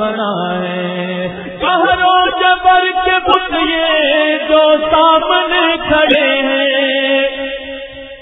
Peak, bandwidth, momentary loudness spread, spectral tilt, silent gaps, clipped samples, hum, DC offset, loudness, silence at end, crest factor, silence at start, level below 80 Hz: 0 dBFS; 4 kHz; 10 LU; -7 dB/octave; none; under 0.1%; none; under 0.1%; -12 LUFS; 0 s; 12 dB; 0 s; -42 dBFS